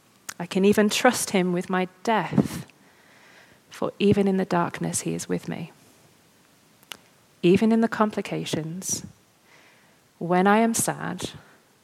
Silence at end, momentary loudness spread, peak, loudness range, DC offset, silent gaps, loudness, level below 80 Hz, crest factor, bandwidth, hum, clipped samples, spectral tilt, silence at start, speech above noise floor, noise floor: 0.45 s; 16 LU; -2 dBFS; 3 LU; under 0.1%; none; -24 LUFS; -60 dBFS; 22 dB; 16 kHz; none; under 0.1%; -5 dB/octave; 0.4 s; 35 dB; -58 dBFS